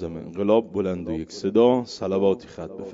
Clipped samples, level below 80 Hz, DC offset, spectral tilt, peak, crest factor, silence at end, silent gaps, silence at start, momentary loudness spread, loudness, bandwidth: under 0.1%; -58 dBFS; under 0.1%; -7 dB/octave; -4 dBFS; 18 dB; 0 s; none; 0 s; 13 LU; -23 LUFS; 7.8 kHz